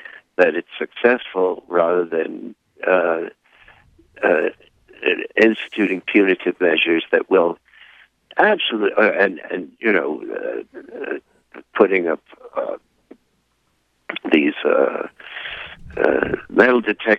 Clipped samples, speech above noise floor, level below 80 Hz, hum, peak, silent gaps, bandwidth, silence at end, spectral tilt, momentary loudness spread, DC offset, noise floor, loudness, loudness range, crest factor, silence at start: under 0.1%; 48 dB; -56 dBFS; none; 0 dBFS; none; 7.4 kHz; 0 s; -6.5 dB/octave; 14 LU; under 0.1%; -66 dBFS; -19 LUFS; 5 LU; 20 dB; 0.05 s